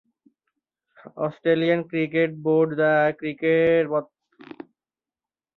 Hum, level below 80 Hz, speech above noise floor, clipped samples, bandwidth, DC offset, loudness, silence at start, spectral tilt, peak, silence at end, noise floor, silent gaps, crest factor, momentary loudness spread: none; -68 dBFS; over 68 dB; under 0.1%; 4.3 kHz; under 0.1%; -22 LUFS; 1.05 s; -9 dB/octave; -8 dBFS; 1.55 s; under -90 dBFS; none; 16 dB; 11 LU